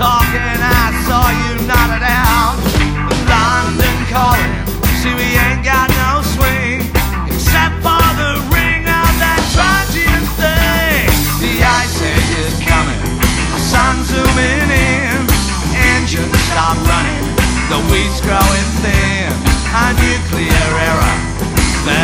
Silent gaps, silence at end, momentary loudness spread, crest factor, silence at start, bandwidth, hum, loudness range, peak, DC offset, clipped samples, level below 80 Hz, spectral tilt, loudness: none; 0 s; 4 LU; 12 dB; 0 s; 17.5 kHz; none; 1 LU; 0 dBFS; under 0.1%; under 0.1%; -18 dBFS; -4 dB/octave; -13 LUFS